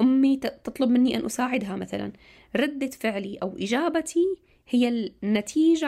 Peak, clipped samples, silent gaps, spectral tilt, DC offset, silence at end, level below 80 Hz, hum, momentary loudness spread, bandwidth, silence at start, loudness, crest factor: -12 dBFS; under 0.1%; none; -5 dB/octave; under 0.1%; 0 s; -60 dBFS; none; 11 LU; 14 kHz; 0 s; -25 LUFS; 12 dB